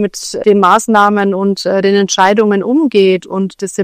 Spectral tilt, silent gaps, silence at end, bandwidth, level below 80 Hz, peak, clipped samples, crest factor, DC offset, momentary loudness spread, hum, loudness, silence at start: -4.5 dB/octave; none; 0 s; 15 kHz; -56 dBFS; 0 dBFS; 1%; 12 dB; under 0.1%; 8 LU; none; -11 LUFS; 0 s